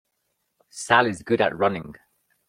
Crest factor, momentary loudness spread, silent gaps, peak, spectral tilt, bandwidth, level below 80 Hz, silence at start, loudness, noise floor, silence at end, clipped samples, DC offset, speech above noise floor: 22 dB; 21 LU; none; -4 dBFS; -4.5 dB/octave; 15 kHz; -62 dBFS; 0.75 s; -22 LUFS; -75 dBFS; 0.55 s; under 0.1%; under 0.1%; 53 dB